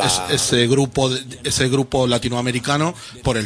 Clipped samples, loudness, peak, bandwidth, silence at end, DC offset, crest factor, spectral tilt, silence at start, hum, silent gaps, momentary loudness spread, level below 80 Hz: under 0.1%; -19 LUFS; -4 dBFS; 11 kHz; 0 s; under 0.1%; 16 dB; -4 dB/octave; 0 s; none; none; 7 LU; -42 dBFS